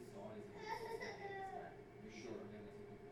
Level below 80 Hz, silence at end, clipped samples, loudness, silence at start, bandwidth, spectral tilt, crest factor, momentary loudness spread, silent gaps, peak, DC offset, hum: -72 dBFS; 0 s; under 0.1%; -51 LUFS; 0 s; 17.5 kHz; -5.5 dB/octave; 16 dB; 8 LU; none; -34 dBFS; under 0.1%; none